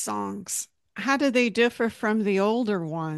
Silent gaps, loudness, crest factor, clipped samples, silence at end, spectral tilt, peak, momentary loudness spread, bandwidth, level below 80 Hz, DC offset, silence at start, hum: none; -25 LUFS; 16 dB; under 0.1%; 0 s; -4.5 dB/octave; -10 dBFS; 9 LU; 12.5 kHz; -68 dBFS; under 0.1%; 0 s; none